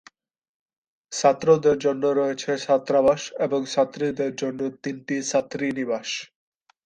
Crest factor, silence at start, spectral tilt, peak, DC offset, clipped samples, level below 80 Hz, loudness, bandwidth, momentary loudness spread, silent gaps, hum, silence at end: 18 dB; 1.1 s; -4.5 dB/octave; -6 dBFS; under 0.1%; under 0.1%; -64 dBFS; -23 LUFS; 9.8 kHz; 10 LU; none; none; 0.6 s